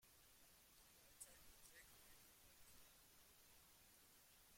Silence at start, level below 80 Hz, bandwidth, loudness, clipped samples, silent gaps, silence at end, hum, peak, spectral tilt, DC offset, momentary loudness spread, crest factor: 0 s; -80 dBFS; 16.5 kHz; -67 LUFS; under 0.1%; none; 0 s; none; -42 dBFS; -1 dB/octave; under 0.1%; 7 LU; 26 dB